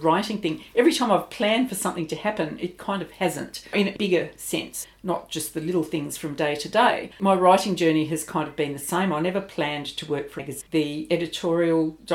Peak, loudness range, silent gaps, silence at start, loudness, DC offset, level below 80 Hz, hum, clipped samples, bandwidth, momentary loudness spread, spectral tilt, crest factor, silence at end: -4 dBFS; 5 LU; none; 0 s; -24 LUFS; under 0.1%; -60 dBFS; none; under 0.1%; 17 kHz; 10 LU; -4.5 dB/octave; 20 dB; 0 s